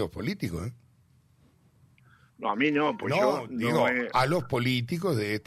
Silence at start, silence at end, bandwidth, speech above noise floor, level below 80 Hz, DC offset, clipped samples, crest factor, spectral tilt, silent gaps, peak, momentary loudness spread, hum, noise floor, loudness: 0 s; 0.05 s; 15 kHz; 35 dB; -58 dBFS; under 0.1%; under 0.1%; 18 dB; -6 dB/octave; none; -12 dBFS; 9 LU; none; -62 dBFS; -27 LUFS